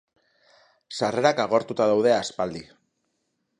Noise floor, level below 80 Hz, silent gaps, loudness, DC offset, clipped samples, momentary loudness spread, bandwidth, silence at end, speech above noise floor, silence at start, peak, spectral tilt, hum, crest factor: -75 dBFS; -66 dBFS; none; -23 LUFS; under 0.1%; under 0.1%; 11 LU; 11 kHz; 1 s; 53 dB; 0.9 s; -4 dBFS; -4.5 dB/octave; none; 22 dB